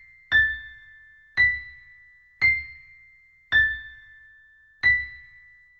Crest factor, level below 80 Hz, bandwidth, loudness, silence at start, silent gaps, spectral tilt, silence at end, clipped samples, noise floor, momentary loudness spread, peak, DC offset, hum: 16 dB; -48 dBFS; 6.8 kHz; -22 LUFS; 0.3 s; none; -3 dB/octave; 0.6 s; under 0.1%; -56 dBFS; 22 LU; -10 dBFS; under 0.1%; none